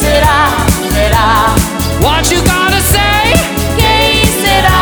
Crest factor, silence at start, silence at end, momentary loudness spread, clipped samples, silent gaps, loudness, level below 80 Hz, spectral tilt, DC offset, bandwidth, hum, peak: 10 dB; 0 s; 0 s; 4 LU; 0.2%; none; -9 LUFS; -18 dBFS; -3.5 dB/octave; under 0.1%; over 20 kHz; none; 0 dBFS